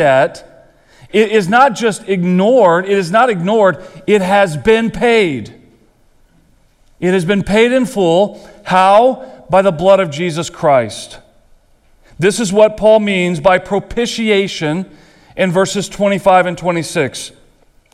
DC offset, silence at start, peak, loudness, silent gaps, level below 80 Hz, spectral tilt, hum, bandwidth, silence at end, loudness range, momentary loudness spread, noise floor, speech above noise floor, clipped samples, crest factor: under 0.1%; 0 s; 0 dBFS; -13 LUFS; none; -44 dBFS; -5 dB/octave; none; 14 kHz; 0.65 s; 4 LU; 9 LU; -51 dBFS; 38 dB; under 0.1%; 14 dB